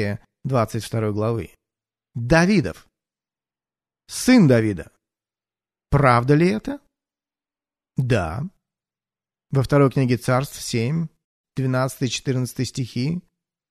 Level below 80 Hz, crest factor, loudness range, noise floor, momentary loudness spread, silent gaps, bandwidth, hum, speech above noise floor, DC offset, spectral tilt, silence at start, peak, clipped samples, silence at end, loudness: -44 dBFS; 20 dB; 5 LU; under -90 dBFS; 15 LU; 11.24-11.44 s; 13.5 kHz; none; over 70 dB; under 0.1%; -6.5 dB/octave; 0 s; -2 dBFS; under 0.1%; 0.5 s; -21 LUFS